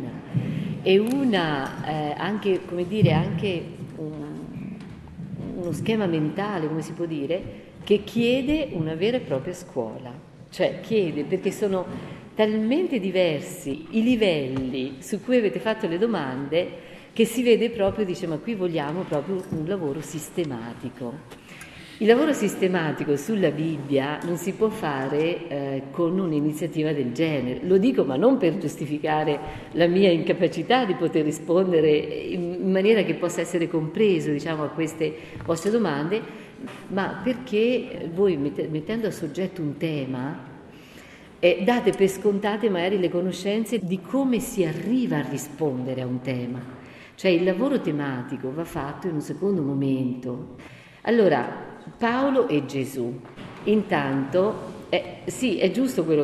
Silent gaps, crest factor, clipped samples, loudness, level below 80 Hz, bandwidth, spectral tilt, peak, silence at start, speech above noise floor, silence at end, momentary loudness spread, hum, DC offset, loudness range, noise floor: none; 20 dB; under 0.1%; -24 LUFS; -56 dBFS; 14.5 kHz; -6 dB/octave; -4 dBFS; 0 s; 22 dB; 0 s; 14 LU; none; under 0.1%; 5 LU; -46 dBFS